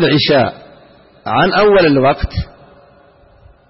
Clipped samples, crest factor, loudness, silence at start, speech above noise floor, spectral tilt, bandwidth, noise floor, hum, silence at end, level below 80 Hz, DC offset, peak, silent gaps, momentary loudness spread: under 0.1%; 12 dB; -12 LUFS; 0 s; 35 dB; -10 dB/octave; 5.8 kHz; -46 dBFS; none; 1.25 s; -32 dBFS; under 0.1%; -2 dBFS; none; 15 LU